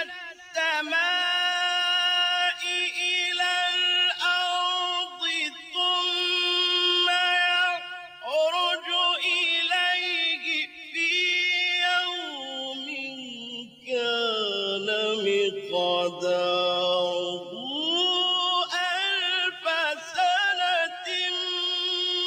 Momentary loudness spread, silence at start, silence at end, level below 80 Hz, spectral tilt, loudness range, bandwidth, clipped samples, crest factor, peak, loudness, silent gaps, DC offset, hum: 10 LU; 0 s; 0 s; -80 dBFS; -1 dB/octave; 4 LU; 16 kHz; under 0.1%; 14 dB; -12 dBFS; -24 LUFS; none; under 0.1%; none